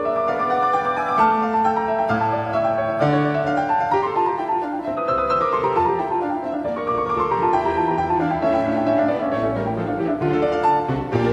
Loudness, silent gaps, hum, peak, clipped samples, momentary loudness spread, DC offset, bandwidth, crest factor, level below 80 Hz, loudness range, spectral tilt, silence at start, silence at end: -20 LUFS; none; none; -6 dBFS; under 0.1%; 5 LU; under 0.1%; 11 kHz; 14 dB; -48 dBFS; 1 LU; -7.5 dB/octave; 0 s; 0 s